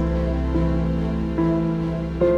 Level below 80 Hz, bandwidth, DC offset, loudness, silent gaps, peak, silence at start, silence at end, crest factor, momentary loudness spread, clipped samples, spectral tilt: -28 dBFS; 6.6 kHz; under 0.1%; -23 LUFS; none; -8 dBFS; 0 s; 0 s; 12 dB; 3 LU; under 0.1%; -9.5 dB/octave